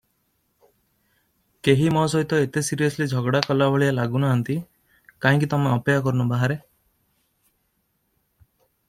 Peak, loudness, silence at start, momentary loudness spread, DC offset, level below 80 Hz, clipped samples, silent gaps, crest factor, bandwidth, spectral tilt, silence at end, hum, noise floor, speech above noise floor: -2 dBFS; -22 LUFS; 1.65 s; 5 LU; under 0.1%; -58 dBFS; under 0.1%; none; 22 dB; 14.5 kHz; -6 dB/octave; 2.3 s; none; -71 dBFS; 50 dB